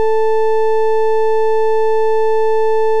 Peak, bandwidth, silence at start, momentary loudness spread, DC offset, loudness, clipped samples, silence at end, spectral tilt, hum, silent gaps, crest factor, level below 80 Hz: -6 dBFS; 8.4 kHz; 0 s; 0 LU; 20%; -15 LUFS; under 0.1%; 0 s; -4.5 dB/octave; none; none; 4 dB; under -90 dBFS